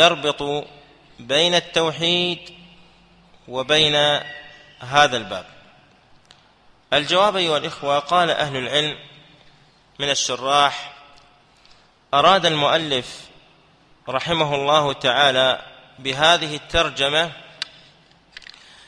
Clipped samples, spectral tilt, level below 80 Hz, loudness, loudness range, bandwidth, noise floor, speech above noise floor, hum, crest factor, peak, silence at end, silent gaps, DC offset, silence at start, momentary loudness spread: under 0.1%; -3 dB/octave; -50 dBFS; -19 LUFS; 3 LU; 11 kHz; -54 dBFS; 35 dB; none; 22 dB; 0 dBFS; 1.25 s; none; under 0.1%; 0 s; 17 LU